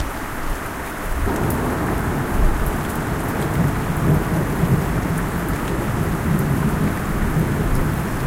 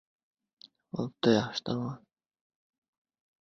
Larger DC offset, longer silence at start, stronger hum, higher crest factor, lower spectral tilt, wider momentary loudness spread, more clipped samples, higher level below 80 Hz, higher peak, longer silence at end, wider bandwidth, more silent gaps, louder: first, 0.1% vs under 0.1%; second, 0 s vs 0.95 s; neither; second, 16 dB vs 24 dB; about the same, -6.5 dB/octave vs -6 dB/octave; second, 7 LU vs 14 LU; neither; first, -26 dBFS vs -70 dBFS; first, -4 dBFS vs -10 dBFS; second, 0 s vs 1.45 s; first, 17 kHz vs 7.6 kHz; neither; first, -21 LUFS vs -31 LUFS